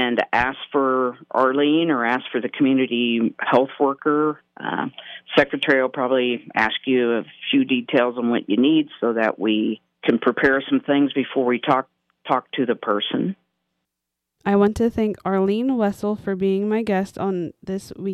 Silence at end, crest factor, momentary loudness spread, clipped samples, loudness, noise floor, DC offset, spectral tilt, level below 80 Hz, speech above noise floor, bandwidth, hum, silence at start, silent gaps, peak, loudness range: 0 s; 18 dB; 8 LU; under 0.1%; -21 LUFS; -82 dBFS; under 0.1%; -6.5 dB/octave; -54 dBFS; 62 dB; 12 kHz; none; 0 s; none; -4 dBFS; 3 LU